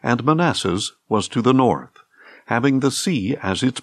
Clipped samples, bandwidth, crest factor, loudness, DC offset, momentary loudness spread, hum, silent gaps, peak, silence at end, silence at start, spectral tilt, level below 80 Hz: under 0.1%; 14 kHz; 16 dB; -20 LUFS; under 0.1%; 6 LU; none; none; -4 dBFS; 0 s; 0.05 s; -5 dB/octave; -62 dBFS